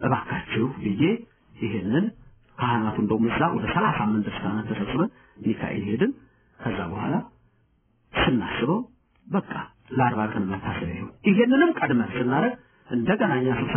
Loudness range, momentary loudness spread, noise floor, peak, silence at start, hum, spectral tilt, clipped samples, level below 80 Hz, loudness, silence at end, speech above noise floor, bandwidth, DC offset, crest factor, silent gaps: 5 LU; 9 LU; -65 dBFS; -8 dBFS; 0 s; none; -4 dB/octave; under 0.1%; -50 dBFS; -25 LUFS; 0 s; 41 dB; 3.5 kHz; under 0.1%; 18 dB; none